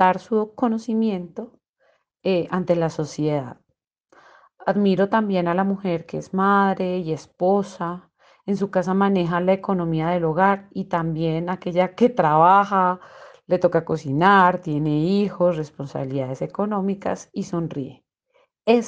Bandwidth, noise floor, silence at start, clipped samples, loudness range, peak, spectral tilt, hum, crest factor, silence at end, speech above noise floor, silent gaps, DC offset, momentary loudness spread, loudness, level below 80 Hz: 8.2 kHz; -75 dBFS; 0 s; under 0.1%; 7 LU; -4 dBFS; -7.5 dB/octave; none; 18 dB; 0 s; 54 dB; 1.69-1.74 s, 3.87-3.91 s, 4.00-4.04 s; under 0.1%; 13 LU; -21 LUFS; -58 dBFS